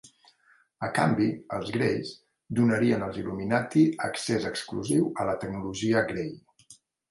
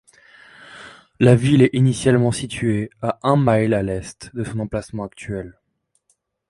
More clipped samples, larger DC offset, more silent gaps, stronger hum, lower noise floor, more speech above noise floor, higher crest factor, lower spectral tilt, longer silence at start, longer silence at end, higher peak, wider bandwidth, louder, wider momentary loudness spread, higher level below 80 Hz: neither; neither; neither; neither; second, -64 dBFS vs -68 dBFS; second, 37 dB vs 50 dB; about the same, 20 dB vs 20 dB; about the same, -6 dB/octave vs -7 dB/octave; second, 0.05 s vs 0.7 s; second, 0.4 s vs 1 s; second, -8 dBFS vs 0 dBFS; about the same, 11.5 kHz vs 11.5 kHz; second, -27 LUFS vs -19 LUFS; second, 10 LU vs 17 LU; second, -60 dBFS vs -46 dBFS